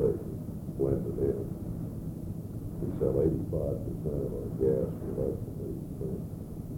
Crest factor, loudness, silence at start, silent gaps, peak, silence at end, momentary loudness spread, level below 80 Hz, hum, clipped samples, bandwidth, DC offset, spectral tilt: 18 dB; -33 LUFS; 0 s; none; -14 dBFS; 0 s; 10 LU; -44 dBFS; none; under 0.1%; 17 kHz; under 0.1%; -10 dB/octave